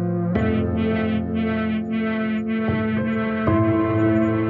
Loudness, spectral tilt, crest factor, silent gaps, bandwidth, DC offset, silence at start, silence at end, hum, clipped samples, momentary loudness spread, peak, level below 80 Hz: -22 LUFS; -10 dB/octave; 14 dB; none; 4.7 kHz; under 0.1%; 0 s; 0 s; none; under 0.1%; 4 LU; -6 dBFS; -46 dBFS